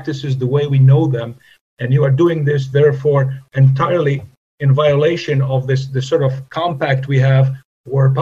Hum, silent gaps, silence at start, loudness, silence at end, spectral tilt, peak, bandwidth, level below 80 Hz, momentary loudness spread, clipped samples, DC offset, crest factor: none; 1.61-1.77 s, 4.37-4.58 s, 7.65-7.84 s; 0 s; -15 LUFS; 0 s; -8 dB/octave; 0 dBFS; 7.2 kHz; -54 dBFS; 8 LU; under 0.1%; 0.1%; 14 dB